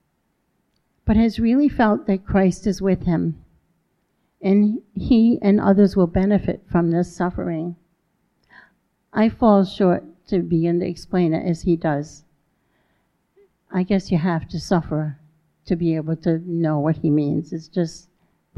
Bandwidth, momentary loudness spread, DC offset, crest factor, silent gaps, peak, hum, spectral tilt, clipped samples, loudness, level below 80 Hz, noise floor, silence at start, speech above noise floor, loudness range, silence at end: 10.5 kHz; 11 LU; under 0.1%; 18 dB; none; -4 dBFS; none; -8 dB/octave; under 0.1%; -20 LUFS; -42 dBFS; -69 dBFS; 1.05 s; 50 dB; 6 LU; 0.6 s